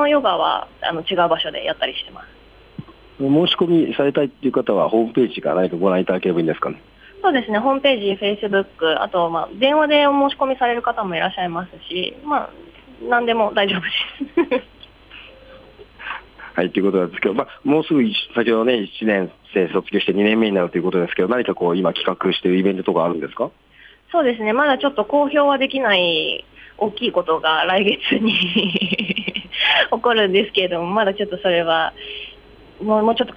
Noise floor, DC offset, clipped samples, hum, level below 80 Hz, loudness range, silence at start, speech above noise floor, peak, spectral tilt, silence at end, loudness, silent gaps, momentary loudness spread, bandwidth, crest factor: -44 dBFS; under 0.1%; under 0.1%; none; -54 dBFS; 4 LU; 0 s; 26 dB; -4 dBFS; -7 dB/octave; 0 s; -19 LUFS; none; 9 LU; 8.2 kHz; 16 dB